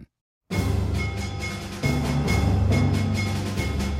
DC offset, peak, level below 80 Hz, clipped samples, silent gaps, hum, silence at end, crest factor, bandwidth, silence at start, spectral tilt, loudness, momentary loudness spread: under 0.1%; -10 dBFS; -32 dBFS; under 0.1%; 0.21-0.41 s; none; 0 s; 14 dB; 15.5 kHz; 0 s; -6 dB/octave; -25 LUFS; 8 LU